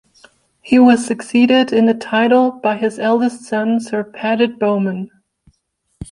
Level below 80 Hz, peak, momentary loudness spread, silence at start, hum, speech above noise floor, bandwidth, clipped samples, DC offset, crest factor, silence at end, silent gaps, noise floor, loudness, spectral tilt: -52 dBFS; -2 dBFS; 10 LU; 0.65 s; none; 52 dB; 11 kHz; under 0.1%; under 0.1%; 14 dB; 0.1 s; none; -67 dBFS; -15 LUFS; -5.5 dB/octave